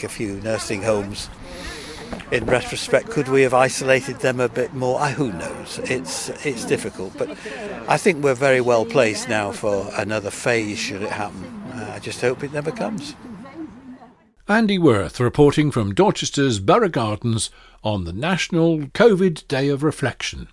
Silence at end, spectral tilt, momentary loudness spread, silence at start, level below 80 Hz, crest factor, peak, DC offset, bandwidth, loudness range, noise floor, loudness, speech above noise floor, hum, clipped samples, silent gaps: 0.05 s; -5 dB/octave; 15 LU; 0 s; -46 dBFS; 20 dB; 0 dBFS; under 0.1%; 12 kHz; 6 LU; -49 dBFS; -20 LUFS; 28 dB; none; under 0.1%; none